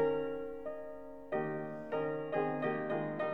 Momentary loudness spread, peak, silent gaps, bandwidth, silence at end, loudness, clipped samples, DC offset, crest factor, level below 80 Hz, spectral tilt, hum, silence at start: 10 LU; -20 dBFS; none; 5.4 kHz; 0 s; -38 LUFS; under 0.1%; 0.2%; 16 dB; -70 dBFS; -8.5 dB/octave; none; 0 s